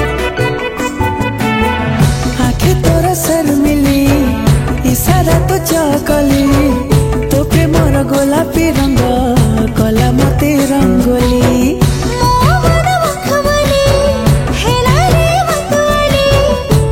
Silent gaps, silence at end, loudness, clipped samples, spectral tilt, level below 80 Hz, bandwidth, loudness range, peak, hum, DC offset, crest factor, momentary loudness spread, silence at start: none; 0 s; -11 LUFS; under 0.1%; -5.5 dB/octave; -20 dBFS; 17 kHz; 1 LU; 0 dBFS; none; under 0.1%; 10 dB; 3 LU; 0 s